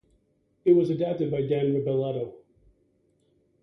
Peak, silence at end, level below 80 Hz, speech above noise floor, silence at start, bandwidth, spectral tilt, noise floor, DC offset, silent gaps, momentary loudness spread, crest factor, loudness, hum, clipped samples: -10 dBFS; 1.25 s; -64 dBFS; 44 dB; 0.65 s; 5.8 kHz; -10 dB/octave; -68 dBFS; under 0.1%; none; 10 LU; 18 dB; -25 LUFS; none; under 0.1%